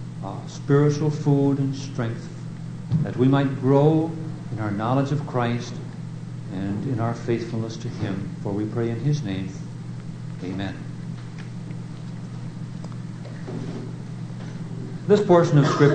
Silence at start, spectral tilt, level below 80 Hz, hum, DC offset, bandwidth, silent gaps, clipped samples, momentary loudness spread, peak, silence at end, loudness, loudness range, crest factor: 0 s; -8 dB/octave; -52 dBFS; none; under 0.1%; 9.2 kHz; none; under 0.1%; 16 LU; -2 dBFS; 0 s; -25 LUFS; 11 LU; 20 dB